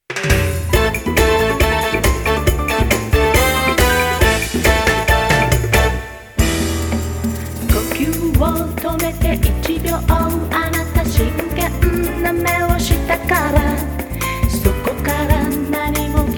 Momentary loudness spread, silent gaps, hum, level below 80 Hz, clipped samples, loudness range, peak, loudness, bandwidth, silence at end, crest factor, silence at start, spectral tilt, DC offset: 6 LU; none; none; -22 dBFS; under 0.1%; 4 LU; 0 dBFS; -16 LUFS; over 20 kHz; 0 s; 16 dB; 0.1 s; -5 dB/octave; under 0.1%